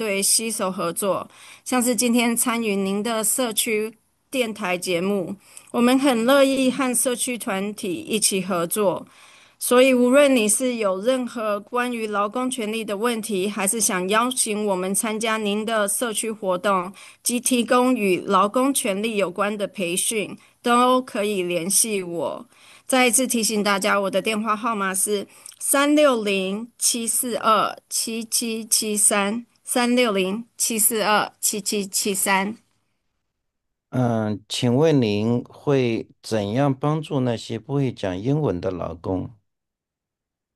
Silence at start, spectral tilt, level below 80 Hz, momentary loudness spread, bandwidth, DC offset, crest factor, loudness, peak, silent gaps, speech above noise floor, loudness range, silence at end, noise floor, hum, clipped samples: 0 s; -3.5 dB/octave; -66 dBFS; 10 LU; 13 kHz; under 0.1%; 20 dB; -21 LUFS; -2 dBFS; none; 64 dB; 4 LU; 1.25 s; -85 dBFS; none; under 0.1%